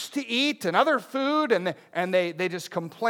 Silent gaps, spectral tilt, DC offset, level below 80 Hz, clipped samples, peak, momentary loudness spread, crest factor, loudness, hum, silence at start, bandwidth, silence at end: none; -4.5 dB/octave; under 0.1%; -86 dBFS; under 0.1%; -6 dBFS; 8 LU; 18 dB; -25 LUFS; none; 0 s; 18.5 kHz; 0 s